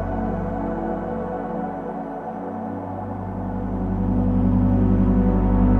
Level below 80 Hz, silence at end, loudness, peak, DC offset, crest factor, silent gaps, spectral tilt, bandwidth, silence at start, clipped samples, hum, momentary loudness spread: -28 dBFS; 0 s; -23 LUFS; -6 dBFS; under 0.1%; 14 dB; none; -11.5 dB/octave; 3.4 kHz; 0 s; under 0.1%; none; 11 LU